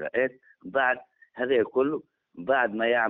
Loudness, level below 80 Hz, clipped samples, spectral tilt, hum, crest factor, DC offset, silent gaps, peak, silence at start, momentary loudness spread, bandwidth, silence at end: -27 LUFS; -70 dBFS; under 0.1%; -2 dB/octave; none; 16 dB; under 0.1%; none; -10 dBFS; 0 s; 13 LU; 4 kHz; 0 s